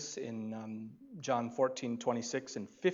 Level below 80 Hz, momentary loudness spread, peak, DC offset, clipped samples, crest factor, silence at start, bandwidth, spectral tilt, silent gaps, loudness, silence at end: -84 dBFS; 11 LU; -18 dBFS; under 0.1%; under 0.1%; 18 dB; 0 s; 7.8 kHz; -4.5 dB/octave; none; -37 LUFS; 0 s